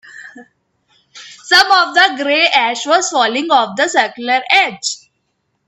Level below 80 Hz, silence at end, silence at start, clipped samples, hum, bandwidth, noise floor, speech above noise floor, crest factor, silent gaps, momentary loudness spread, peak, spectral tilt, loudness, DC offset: -64 dBFS; 0.7 s; 0.05 s; under 0.1%; none; 15.5 kHz; -67 dBFS; 54 dB; 16 dB; none; 9 LU; 0 dBFS; -0.5 dB/octave; -12 LUFS; under 0.1%